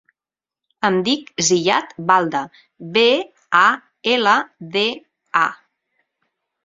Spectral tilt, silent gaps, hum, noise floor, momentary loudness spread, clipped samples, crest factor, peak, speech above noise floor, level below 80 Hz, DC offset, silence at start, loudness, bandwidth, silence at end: -2.5 dB/octave; none; none; under -90 dBFS; 9 LU; under 0.1%; 20 dB; 0 dBFS; over 72 dB; -66 dBFS; under 0.1%; 0.8 s; -18 LUFS; 7.8 kHz; 1.1 s